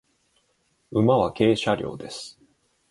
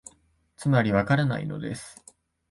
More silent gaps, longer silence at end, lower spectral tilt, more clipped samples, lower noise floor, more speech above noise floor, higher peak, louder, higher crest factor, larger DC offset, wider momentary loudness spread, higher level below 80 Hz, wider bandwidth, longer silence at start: neither; about the same, 0.6 s vs 0.6 s; about the same, -6.5 dB/octave vs -7 dB/octave; neither; first, -69 dBFS vs -64 dBFS; first, 46 dB vs 39 dB; about the same, -6 dBFS vs -8 dBFS; about the same, -23 LUFS vs -25 LUFS; about the same, 20 dB vs 20 dB; neither; about the same, 16 LU vs 15 LU; about the same, -56 dBFS vs -54 dBFS; about the same, 11.5 kHz vs 11.5 kHz; first, 0.9 s vs 0.6 s